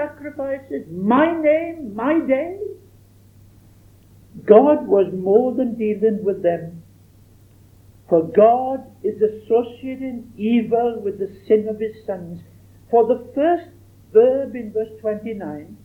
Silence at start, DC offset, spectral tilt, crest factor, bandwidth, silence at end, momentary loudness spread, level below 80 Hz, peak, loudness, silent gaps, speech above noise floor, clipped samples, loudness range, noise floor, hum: 0 s; under 0.1%; -8.5 dB/octave; 20 dB; 4.2 kHz; 0.1 s; 15 LU; -58 dBFS; 0 dBFS; -19 LUFS; none; 31 dB; under 0.1%; 4 LU; -49 dBFS; none